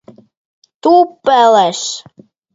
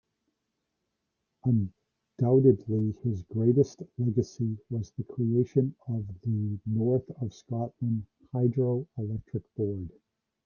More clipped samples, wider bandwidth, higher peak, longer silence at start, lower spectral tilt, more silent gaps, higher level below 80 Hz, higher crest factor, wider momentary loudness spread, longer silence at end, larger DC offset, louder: neither; first, 8 kHz vs 7 kHz; first, 0 dBFS vs -10 dBFS; second, 0.85 s vs 1.45 s; second, -3 dB/octave vs -10.5 dB/octave; neither; about the same, -64 dBFS vs -62 dBFS; second, 14 dB vs 20 dB; about the same, 12 LU vs 11 LU; about the same, 0.55 s vs 0.55 s; neither; first, -12 LUFS vs -29 LUFS